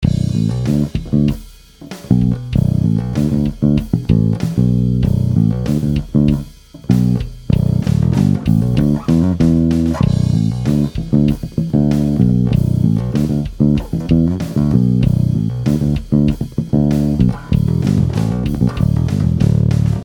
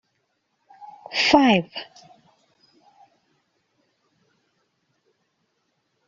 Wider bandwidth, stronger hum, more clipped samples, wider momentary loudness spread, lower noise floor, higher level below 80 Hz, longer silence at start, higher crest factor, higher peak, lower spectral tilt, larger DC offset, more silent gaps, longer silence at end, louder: first, 15 kHz vs 7.6 kHz; neither; neither; second, 4 LU vs 28 LU; second, -37 dBFS vs -73 dBFS; first, -28 dBFS vs -62 dBFS; second, 0 s vs 0.8 s; second, 14 dB vs 24 dB; about the same, 0 dBFS vs -2 dBFS; first, -9 dB/octave vs -2.5 dB/octave; neither; neither; second, 0 s vs 4.25 s; first, -15 LUFS vs -19 LUFS